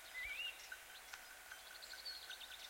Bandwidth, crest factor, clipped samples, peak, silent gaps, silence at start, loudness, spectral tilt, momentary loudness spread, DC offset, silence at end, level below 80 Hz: 16.5 kHz; 20 dB; under 0.1%; -32 dBFS; none; 0 s; -49 LUFS; 1 dB/octave; 9 LU; under 0.1%; 0 s; -74 dBFS